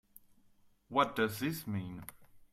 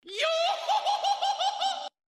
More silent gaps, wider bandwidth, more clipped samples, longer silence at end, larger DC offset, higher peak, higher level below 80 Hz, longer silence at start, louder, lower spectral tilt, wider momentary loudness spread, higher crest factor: neither; first, 16 kHz vs 14 kHz; neither; second, 0.1 s vs 0.25 s; neither; about the same, -16 dBFS vs -14 dBFS; first, -68 dBFS vs -80 dBFS; first, 0.9 s vs 0.05 s; second, -35 LUFS vs -28 LUFS; first, -5 dB/octave vs 2.5 dB/octave; first, 16 LU vs 4 LU; first, 22 dB vs 14 dB